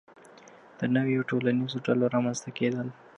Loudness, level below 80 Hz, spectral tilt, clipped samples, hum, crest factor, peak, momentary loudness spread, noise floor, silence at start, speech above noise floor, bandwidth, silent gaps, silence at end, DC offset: -28 LUFS; -74 dBFS; -6 dB/octave; under 0.1%; none; 16 dB; -12 dBFS; 6 LU; -52 dBFS; 0.55 s; 25 dB; 9.8 kHz; none; 0.25 s; under 0.1%